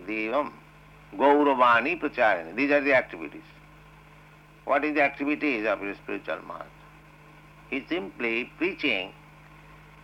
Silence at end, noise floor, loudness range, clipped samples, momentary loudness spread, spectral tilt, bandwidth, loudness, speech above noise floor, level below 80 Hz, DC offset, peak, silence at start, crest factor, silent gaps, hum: 0.3 s; -52 dBFS; 8 LU; under 0.1%; 19 LU; -6 dB/octave; 10 kHz; -25 LUFS; 27 dB; -60 dBFS; under 0.1%; -10 dBFS; 0 s; 18 dB; none; none